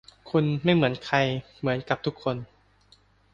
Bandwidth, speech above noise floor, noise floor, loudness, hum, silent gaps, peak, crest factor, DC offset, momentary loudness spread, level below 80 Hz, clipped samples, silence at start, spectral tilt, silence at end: 7.6 kHz; 35 dB; -60 dBFS; -26 LUFS; 50 Hz at -55 dBFS; none; -6 dBFS; 20 dB; under 0.1%; 9 LU; -58 dBFS; under 0.1%; 0.25 s; -7 dB/octave; 0.9 s